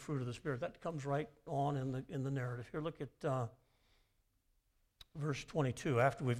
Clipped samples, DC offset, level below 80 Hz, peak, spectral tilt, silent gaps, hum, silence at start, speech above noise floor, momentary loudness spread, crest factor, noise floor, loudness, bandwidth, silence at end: under 0.1%; under 0.1%; -66 dBFS; -18 dBFS; -7 dB/octave; none; none; 0 s; 39 dB; 9 LU; 22 dB; -78 dBFS; -40 LUFS; 12.5 kHz; 0 s